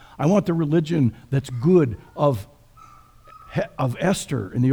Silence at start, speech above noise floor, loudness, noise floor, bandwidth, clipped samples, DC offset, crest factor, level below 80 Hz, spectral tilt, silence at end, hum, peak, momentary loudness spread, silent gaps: 0.2 s; 28 dB; -22 LUFS; -48 dBFS; over 20 kHz; under 0.1%; under 0.1%; 18 dB; -50 dBFS; -7 dB/octave; 0 s; none; -4 dBFS; 9 LU; none